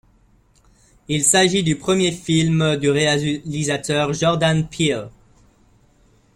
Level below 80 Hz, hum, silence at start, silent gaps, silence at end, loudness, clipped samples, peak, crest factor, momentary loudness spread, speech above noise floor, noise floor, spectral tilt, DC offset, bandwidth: -50 dBFS; none; 1.1 s; none; 1.25 s; -18 LUFS; under 0.1%; -2 dBFS; 18 dB; 8 LU; 37 dB; -56 dBFS; -4 dB/octave; under 0.1%; 14 kHz